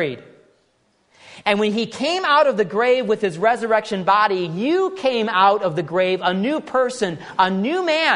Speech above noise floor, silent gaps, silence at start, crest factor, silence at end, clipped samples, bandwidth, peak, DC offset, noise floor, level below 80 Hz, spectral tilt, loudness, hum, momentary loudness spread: 44 dB; none; 0 s; 18 dB; 0 s; under 0.1%; 10.5 kHz; -2 dBFS; under 0.1%; -63 dBFS; -66 dBFS; -5 dB/octave; -19 LUFS; none; 6 LU